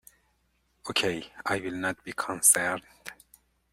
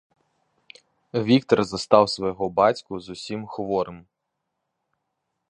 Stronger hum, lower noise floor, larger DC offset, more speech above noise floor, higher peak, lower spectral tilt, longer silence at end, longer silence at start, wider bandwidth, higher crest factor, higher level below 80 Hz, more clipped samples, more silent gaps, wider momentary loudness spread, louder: neither; second, -71 dBFS vs -80 dBFS; neither; second, 43 dB vs 58 dB; second, -6 dBFS vs -2 dBFS; second, -1.5 dB/octave vs -6 dB/octave; second, 0.6 s vs 1.5 s; second, 0.85 s vs 1.15 s; first, 16 kHz vs 10.5 kHz; about the same, 24 dB vs 24 dB; second, -66 dBFS vs -60 dBFS; neither; neither; first, 24 LU vs 14 LU; second, -26 LUFS vs -23 LUFS